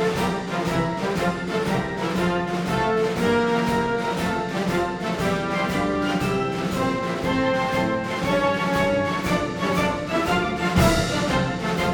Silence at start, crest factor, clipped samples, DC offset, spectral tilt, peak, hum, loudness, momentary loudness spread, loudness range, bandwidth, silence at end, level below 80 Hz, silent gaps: 0 s; 18 dB; under 0.1%; under 0.1%; -5.5 dB/octave; -6 dBFS; none; -23 LUFS; 4 LU; 2 LU; over 20 kHz; 0 s; -42 dBFS; none